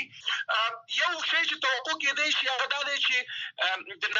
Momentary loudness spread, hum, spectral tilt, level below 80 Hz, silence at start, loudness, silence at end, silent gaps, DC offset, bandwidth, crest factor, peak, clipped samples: 5 LU; none; 1 dB/octave; -90 dBFS; 0 s; -27 LUFS; 0 s; none; under 0.1%; 8.2 kHz; 18 dB; -12 dBFS; under 0.1%